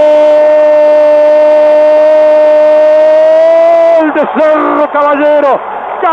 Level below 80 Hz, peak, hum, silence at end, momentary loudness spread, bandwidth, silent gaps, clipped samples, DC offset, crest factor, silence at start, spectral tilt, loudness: -54 dBFS; 0 dBFS; none; 0 s; 4 LU; 6.4 kHz; none; under 0.1%; under 0.1%; 6 dB; 0 s; -5 dB/octave; -6 LUFS